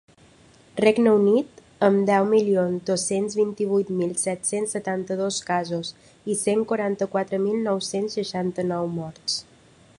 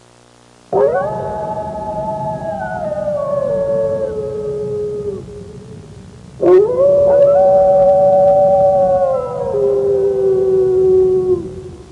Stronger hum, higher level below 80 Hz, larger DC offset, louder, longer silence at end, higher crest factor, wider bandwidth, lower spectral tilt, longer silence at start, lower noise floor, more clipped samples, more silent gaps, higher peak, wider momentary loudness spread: neither; second, -64 dBFS vs -44 dBFS; neither; second, -23 LUFS vs -14 LUFS; first, 0.55 s vs 0.1 s; first, 20 dB vs 12 dB; first, 11.5 kHz vs 9.2 kHz; second, -4.5 dB/octave vs -8.5 dB/octave; about the same, 0.75 s vs 0.7 s; first, -54 dBFS vs -46 dBFS; neither; neither; about the same, -2 dBFS vs -2 dBFS; second, 10 LU vs 13 LU